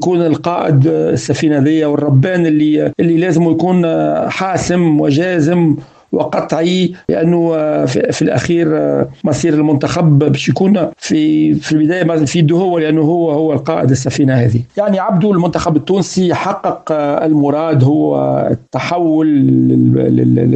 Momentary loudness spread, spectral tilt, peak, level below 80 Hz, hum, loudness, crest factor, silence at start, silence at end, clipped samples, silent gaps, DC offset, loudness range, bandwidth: 5 LU; -7 dB/octave; 0 dBFS; -46 dBFS; none; -12 LUFS; 12 dB; 0 s; 0 s; under 0.1%; none; under 0.1%; 2 LU; 8.8 kHz